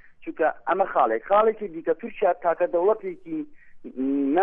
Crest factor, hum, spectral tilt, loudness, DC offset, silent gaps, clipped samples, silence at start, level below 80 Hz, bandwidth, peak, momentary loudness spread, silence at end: 16 dB; none; -9 dB/octave; -24 LUFS; under 0.1%; none; under 0.1%; 0.05 s; -60 dBFS; 3.8 kHz; -8 dBFS; 13 LU; 0 s